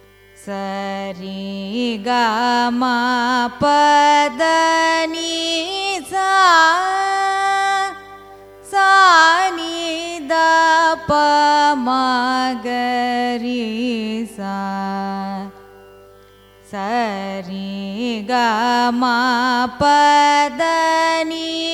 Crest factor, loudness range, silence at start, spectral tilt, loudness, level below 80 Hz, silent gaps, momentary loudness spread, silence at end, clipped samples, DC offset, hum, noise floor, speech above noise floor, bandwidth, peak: 16 dB; 10 LU; 0.4 s; -3 dB/octave; -16 LUFS; -54 dBFS; none; 14 LU; 0 s; under 0.1%; under 0.1%; 50 Hz at -55 dBFS; -47 dBFS; 30 dB; 15 kHz; 0 dBFS